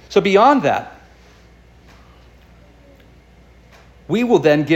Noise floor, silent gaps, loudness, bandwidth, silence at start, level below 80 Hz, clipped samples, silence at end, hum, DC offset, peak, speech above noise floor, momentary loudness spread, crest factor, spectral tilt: -47 dBFS; none; -15 LUFS; 16 kHz; 0.1 s; -50 dBFS; under 0.1%; 0 s; none; under 0.1%; -2 dBFS; 33 dB; 11 LU; 18 dB; -6 dB/octave